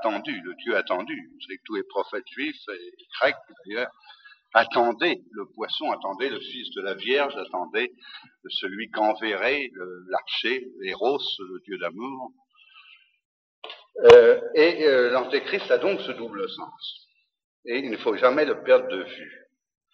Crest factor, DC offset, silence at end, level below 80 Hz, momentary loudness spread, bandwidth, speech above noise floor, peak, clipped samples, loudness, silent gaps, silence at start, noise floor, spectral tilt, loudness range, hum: 24 dB; under 0.1%; 0.6 s; -68 dBFS; 19 LU; 7.2 kHz; 30 dB; 0 dBFS; under 0.1%; -23 LUFS; 13.25-13.62 s, 17.44-17.63 s; 0 s; -54 dBFS; -4.5 dB/octave; 11 LU; none